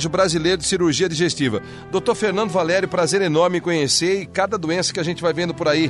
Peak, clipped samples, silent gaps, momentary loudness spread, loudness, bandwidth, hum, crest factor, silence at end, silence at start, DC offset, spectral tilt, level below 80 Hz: -6 dBFS; under 0.1%; none; 4 LU; -19 LUFS; 11.5 kHz; none; 14 dB; 0 s; 0 s; under 0.1%; -4 dB/octave; -50 dBFS